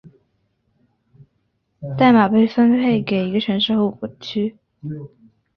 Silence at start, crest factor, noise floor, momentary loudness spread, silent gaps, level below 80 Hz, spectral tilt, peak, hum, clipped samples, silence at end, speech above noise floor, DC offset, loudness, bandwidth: 0.05 s; 18 dB; -69 dBFS; 19 LU; none; -58 dBFS; -8 dB/octave; -2 dBFS; none; under 0.1%; 0.5 s; 51 dB; under 0.1%; -17 LUFS; 6.2 kHz